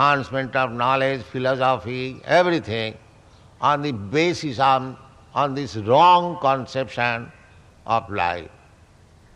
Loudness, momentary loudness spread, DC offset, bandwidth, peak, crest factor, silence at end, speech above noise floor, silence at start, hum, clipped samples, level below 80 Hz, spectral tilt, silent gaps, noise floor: -21 LUFS; 12 LU; under 0.1%; 10.5 kHz; -2 dBFS; 20 dB; 0.9 s; 31 dB; 0 s; none; under 0.1%; -56 dBFS; -5.5 dB/octave; none; -51 dBFS